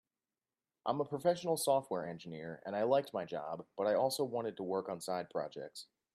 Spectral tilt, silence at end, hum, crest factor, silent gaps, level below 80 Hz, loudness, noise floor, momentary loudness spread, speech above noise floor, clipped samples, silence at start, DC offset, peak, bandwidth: -4.5 dB/octave; 0.3 s; none; 18 dB; none; -82 dBFS; -37 LUFS; under -90 dBFS; 12 LU; over 54 dB; under 0.1%; 0.85 s; under 0.1%; -18 dBFS; 15 kHz